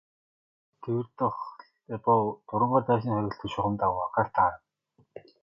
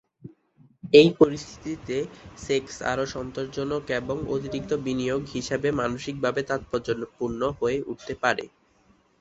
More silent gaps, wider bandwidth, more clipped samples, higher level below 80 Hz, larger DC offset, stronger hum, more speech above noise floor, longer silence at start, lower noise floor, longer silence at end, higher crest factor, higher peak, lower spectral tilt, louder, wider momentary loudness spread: neither; second, 7.2 kHz vs 8 kHz; neither; second, -58 dBFS vs -52 dBFS; neither; neither; about the same, 40 dB vs 37 dB; first, 0.8 s vs 0.25 s; first, -68 dBFS vs -62 dBFS; second, 0.25 s vs 0.75 s; about the same, 20 dB vs 24 dB; second, -10 dBFS vs -2 dBFS; first, -9 dB/octave vs -5.5 dB/octave; about the same, -28 LUFS vs -26 LUFS; about the same, 14 LU vs 14 LU